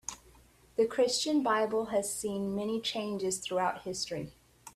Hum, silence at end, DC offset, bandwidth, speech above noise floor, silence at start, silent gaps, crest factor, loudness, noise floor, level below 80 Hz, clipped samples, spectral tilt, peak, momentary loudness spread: none; 0.05 s; under 0.1%; 14.5 kHz; 29 dB; 0.1 s; none; 16 dB; -32 LUFS; -60 dBFS; -66 dBFS; under 0.1%; -3.5 dB/octave; -16 dBFS; 10 LU